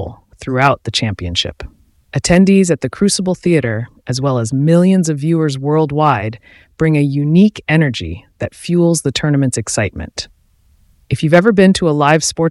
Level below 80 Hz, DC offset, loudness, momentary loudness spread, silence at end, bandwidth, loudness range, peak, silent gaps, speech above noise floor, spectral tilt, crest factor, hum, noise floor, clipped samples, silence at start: -40 dBFS; under 0.1%; -14 LUFS; 14 LU; 0 s; 12 kHz; 2 LU; 0 dBFS; none; 39 dB; -5.5 dB/octave; 14 dB; none; -52 dBFS; under 0.1%; 0 s